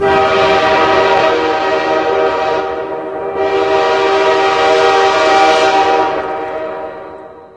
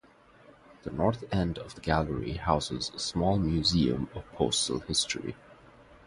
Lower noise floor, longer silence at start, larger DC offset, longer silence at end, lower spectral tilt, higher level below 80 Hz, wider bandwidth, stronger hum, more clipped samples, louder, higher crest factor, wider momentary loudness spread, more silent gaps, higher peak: second, -32 dBFS vs -57 dBFS; second, 0 s vs 0.85 s; neither; about the same, 0.1 s vs 0.1 s; about the same, -3.5 dB/octave vs -4.5 dB/octave; about the same, -44 dBFS vs -46 dBFS; about the same, 11 kHz vs 11.5 kHz; neither; neither; first, -12 LUFS vs -29 LUFS; second, 12 dB vs 22 dB; about the same, 11 LU vs 11 LU; neither; first, 0 dBFS vs -8 dBFS